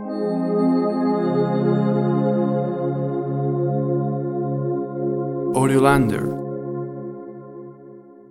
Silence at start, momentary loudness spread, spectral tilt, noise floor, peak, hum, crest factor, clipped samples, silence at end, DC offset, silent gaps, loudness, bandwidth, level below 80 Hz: 0 s; 14 LU; -8 dB/octave; -43 dBFS; -2 dBFS; none; 20 dB; under 0.1%; 0.15 s; under 0.1%; none; -21 LUFS; 13 kHz; -50 dBFS